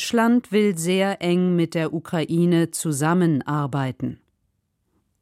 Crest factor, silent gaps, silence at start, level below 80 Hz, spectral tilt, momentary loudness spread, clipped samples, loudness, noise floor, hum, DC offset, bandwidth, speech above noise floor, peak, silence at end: 14 dB; none; 0 s; -64 dBFS; -6 dB/octave; 7 LU; under 0.1%; -22 LUFS; -71 dBFS; none; under 0.1%; 15.5 kHz; 51 dB; -8 dBFS; 1.05 s